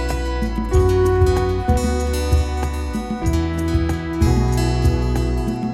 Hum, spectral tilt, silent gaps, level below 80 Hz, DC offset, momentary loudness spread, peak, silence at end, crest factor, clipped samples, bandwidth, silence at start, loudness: none; -7 dB/octave; none; -22 dBFS; under 0.1%; 7 LU; -4 dBFS; 0 s; 14 dB; under 0.1%; 14 kHz; 0 s; -19 LUFS